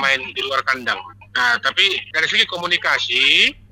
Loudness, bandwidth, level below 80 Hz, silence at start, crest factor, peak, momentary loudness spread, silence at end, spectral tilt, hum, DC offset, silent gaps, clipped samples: -16 LUFS; 16.5 kHz; -56 dBFS; 0 s; 18 dB; 0 dBFS; 8 LU; 0.2 s; -1 dB/octave; none; under 0.1%; none; under 0.1%